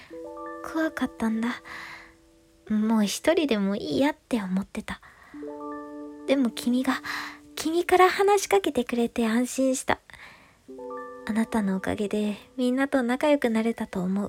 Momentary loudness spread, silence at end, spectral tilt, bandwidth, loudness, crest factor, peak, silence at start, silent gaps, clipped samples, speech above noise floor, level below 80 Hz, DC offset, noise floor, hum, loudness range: 16 LU; 0 s; -5 dB/octave; 16.5 kHz; -26 LUFS; 20 dB; -6 dBFS; 0 s; none; under 0.1%; 33 dB; -58 dBFS; under 0.1%; -58 dBFS; none; 5 LU